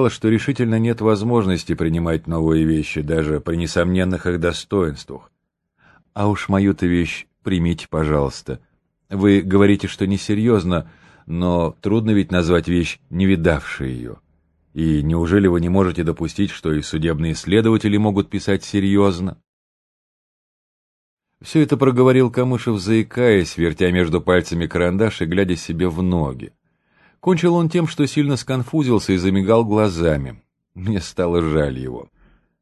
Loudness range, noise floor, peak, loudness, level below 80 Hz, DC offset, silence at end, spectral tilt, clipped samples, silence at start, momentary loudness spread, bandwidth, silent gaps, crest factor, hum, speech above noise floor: 4 LU; -64 dBFS; 0 dBFS; -19 LUFS; -36 dBFS; under 0.1%; 0.55 s; -7 dB/octave; under 0.1%; 0 s; 9 LU; 12 kHz; 19.48-21.17 s; 18 dB; none; 46 dB